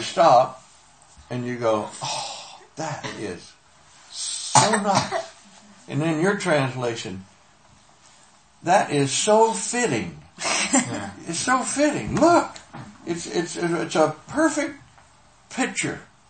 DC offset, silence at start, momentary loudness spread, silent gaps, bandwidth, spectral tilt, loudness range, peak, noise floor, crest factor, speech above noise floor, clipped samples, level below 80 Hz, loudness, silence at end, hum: under 0.1%; 0 s; 16 LU; none; 8.8 kHz; -3.5 dB/octave; 5 LU; 0 dBFS; -55 dBFS; 24 dB; 32 dB; under 0.1%; -58 dBFS; -22 LUFS; 0.25 s; none